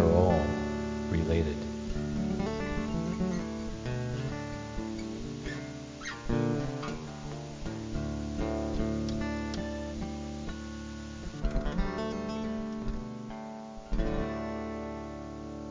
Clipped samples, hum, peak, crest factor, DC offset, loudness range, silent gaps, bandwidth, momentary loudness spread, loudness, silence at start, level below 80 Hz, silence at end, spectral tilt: under 0.1%; none; -10 dBFS; 22 dB; under 0.1%; 4 LU; none; 7.6 kHz; 10 LU; -34 LUFS; 0 s; -40 dBFS; 0 s; -7 dB/octave